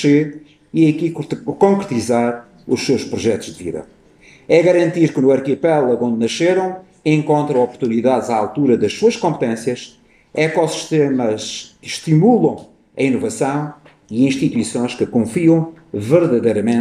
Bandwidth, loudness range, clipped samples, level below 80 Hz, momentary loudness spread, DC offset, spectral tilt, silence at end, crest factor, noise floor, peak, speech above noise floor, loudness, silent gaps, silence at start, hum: 13 kHz; 3 LU; under 0.1%; -58 dBFS; 12 LU; under 0.1%; -6 dB/octave; 0 s; 16 dB; -47 dBFS; 0 dBFS; 31 dB; -17 LUFS; none; 0 s; none